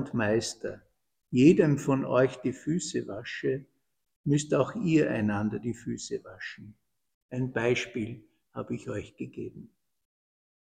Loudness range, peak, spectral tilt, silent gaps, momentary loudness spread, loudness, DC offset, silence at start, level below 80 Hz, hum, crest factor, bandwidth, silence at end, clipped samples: 8 LU; -6 dBFS; -6 dB/octave; 4.16-4.24 s, 7.14-7.29 s; 17 LU; -29 LUFS; under 0.1%; 0 s; -60 dBFS; none; 22 dB; 10 kHz; 1.1 s; under 0.1%